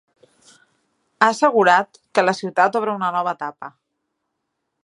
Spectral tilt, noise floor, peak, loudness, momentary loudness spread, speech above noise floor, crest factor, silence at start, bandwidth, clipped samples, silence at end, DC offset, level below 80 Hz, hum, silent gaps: -4.5 dB/octave; -76 dBFS; 0 dBFS; -18 LUFS; 14 LU; 58 dB; 20 dB; 1.2 s; 11.5 kHz; under 0.1%; 1.15 s; under 0.1%; -74 dBFS; none; none